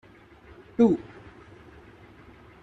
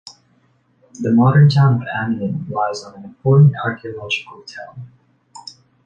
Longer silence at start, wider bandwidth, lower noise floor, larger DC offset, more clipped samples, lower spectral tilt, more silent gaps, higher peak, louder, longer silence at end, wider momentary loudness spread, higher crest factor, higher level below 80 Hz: first, 0.8 s vs 0.05 s; about the same, 7.6 kHz vs 7.4 kHz; second, -52 dBFS vs -58 dBFS; neither; neither; about the same, -8.5 dB/octave vs -7.5 dB/octave; neither; second, -8 dBFS vs -2 dBFS; second, -24 LUFS vs -16 LUFS; first, 1.6 s vs 0.45 s; about the same, 27 LU vs 25 LU; first, 22 dB vs 16 dB; second, -60 dBFS vs -54 dBFS